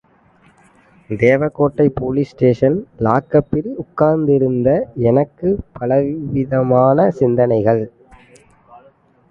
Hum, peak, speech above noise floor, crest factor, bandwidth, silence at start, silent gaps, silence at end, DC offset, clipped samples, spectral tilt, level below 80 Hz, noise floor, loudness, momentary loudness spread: none; 0 dBFS; 37 dB; 16 dB; 7.2 kHz; 1.1 s; none; 0.55 s; under 0.1%; under 0.1%; -10 dB/octave; -44 dBFS; -52 dBFS; -16 LUFS; 7 LU